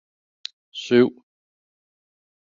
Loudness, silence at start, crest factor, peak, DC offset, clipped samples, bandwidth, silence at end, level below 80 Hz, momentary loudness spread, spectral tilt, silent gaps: -20 LUFS; 0.75 s; 22 dB; -4 dBFS; under 0.1%; under 0.1%; 7.4 kHz; 1.35 s; -70 dBFS; 19 LU; -6 dB/octave; none